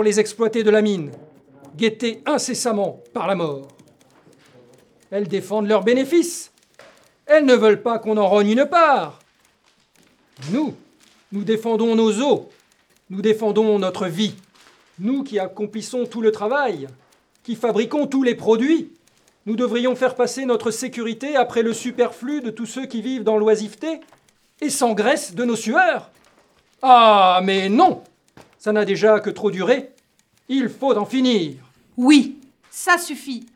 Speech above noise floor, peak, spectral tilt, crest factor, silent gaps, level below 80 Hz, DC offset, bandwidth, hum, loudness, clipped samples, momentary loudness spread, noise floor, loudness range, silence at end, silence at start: 43 dB; 0 dBFS; -4.5 dB/octave; 20 dB; none; -74 dBFS; under 0.1%; 15.5 kHz; none; -19 LUFS; under 0.1%; 14 LU; -62 dBFS; 7 LU; 0.1 s; 0 s